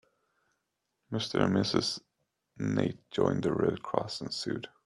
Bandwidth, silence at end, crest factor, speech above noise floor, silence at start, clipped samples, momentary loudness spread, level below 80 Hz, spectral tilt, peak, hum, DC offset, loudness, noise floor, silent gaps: 12 kHz; 0.2 s; 24 dB; 52 dB; 1.1 s; under 0.1%; 9 LU; -64 dBFS; -5.5 dB/octave; -10 dBFS; none; under 0.1%; -31 LUFS; -82 dBFS; none